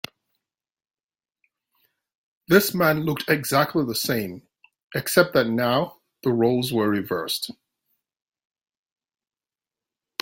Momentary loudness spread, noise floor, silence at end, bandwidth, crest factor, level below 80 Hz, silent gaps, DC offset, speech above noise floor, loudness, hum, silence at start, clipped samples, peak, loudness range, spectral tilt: 13 LU; under -90 dBFS; 2.7 s; 17 kHz; 24 dB; -62 dBFS; 4.83-4.90 s; under 0.1%; over 68 dB; -22 LUFS; none; 2.5 s; under 0.1%; -2 dBFS; 6 LU; -4.5 dB/octave